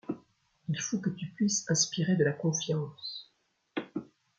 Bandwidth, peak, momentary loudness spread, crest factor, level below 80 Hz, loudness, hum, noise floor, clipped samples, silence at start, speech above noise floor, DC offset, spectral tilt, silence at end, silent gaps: 10 kHz; -12 dBFS; 15 LU; 20 dB; -74 dBFS; -31 LUFS; none; -73 dBFS; under 0.1%; 0.1 s; 42 dB; under 0.1%; -4 dB/octave; 0.35 s; none